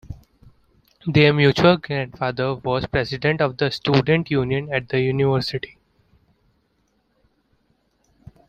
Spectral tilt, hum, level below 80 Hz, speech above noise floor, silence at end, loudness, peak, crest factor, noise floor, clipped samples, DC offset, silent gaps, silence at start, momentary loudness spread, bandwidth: -7 dB/octave; none; -48 dBFS; 47 dB; 2.85 s; -20 LUFS; -2 dBFS; 20 dB; -66 dBFS; under 0.1%; under 0.1%; none; 0.1 s; 12 LU; 8.8 kHz